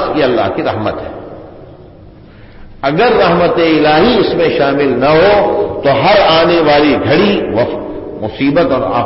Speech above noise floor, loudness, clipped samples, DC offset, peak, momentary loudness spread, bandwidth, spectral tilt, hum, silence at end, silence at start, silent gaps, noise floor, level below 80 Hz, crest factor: 26 dB; -10 LUFS; under 0.1%; under 0.1%; 0 dBFS; 13 LU; 5.8 kHz; -9.5 dB/octave; none; 0 s; 0 s; none; -36 dBFS; -36 dBFS; 12 dB